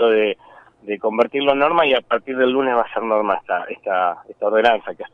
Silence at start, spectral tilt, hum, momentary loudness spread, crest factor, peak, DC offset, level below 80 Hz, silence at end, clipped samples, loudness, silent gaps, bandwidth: 0 s; -6 dB/octave; none; 8 LU; 16 dB; -2 dBFS; under 0.1%; -58 dBFS; 0.1 s; under 0.1%; -19 LUFS; none; 6.2 kHz